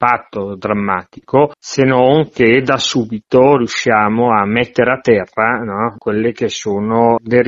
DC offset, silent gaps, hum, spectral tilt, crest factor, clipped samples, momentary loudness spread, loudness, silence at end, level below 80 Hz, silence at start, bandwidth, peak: under 0.1%; none; none; -5.5 dB/octave; 14 dB; under 0.1%; 8 LU; -14 LUFS; 0 s; -48 dBFS; 0 s; 7.8 kHz; 0 dBFS